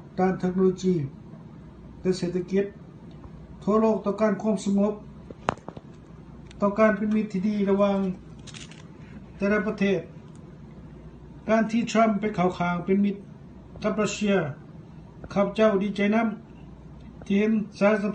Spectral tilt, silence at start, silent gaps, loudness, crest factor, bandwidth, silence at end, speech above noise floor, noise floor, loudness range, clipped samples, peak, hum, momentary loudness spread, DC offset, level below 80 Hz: -7 dB/octave; 0 s; none; -25 LUFS; 22 dB; 9.2 kHz; 0 s; 22 dB; -45 dBFS; 3 LU; under 0.1%; -4 dBFS; none; 23 LU; under 0.1%; -52 dBFS